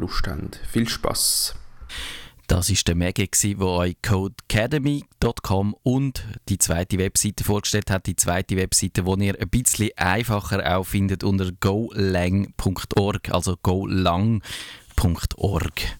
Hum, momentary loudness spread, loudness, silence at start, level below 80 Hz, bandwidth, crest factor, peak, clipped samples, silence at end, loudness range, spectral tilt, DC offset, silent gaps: none; 8 LU; -22 LUFS; 0 s; -36 dBFS; 18.5 kHz; 20 dB; -4 dBFS; under 0.1%; 0 s; 2 LU; -4.5 dB/octave; under 0.1%; none